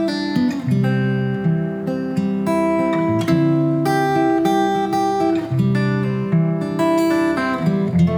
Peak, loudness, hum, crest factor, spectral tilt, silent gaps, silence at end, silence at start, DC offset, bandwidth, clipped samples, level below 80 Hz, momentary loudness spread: -4 dBFS; -18 LUFS; none; 14 dB; -7.5 dB/octave; none; 0 s; 0 s; under 0.1%; 17 kHz; under 0.1%; -50 dBFS; 4 LU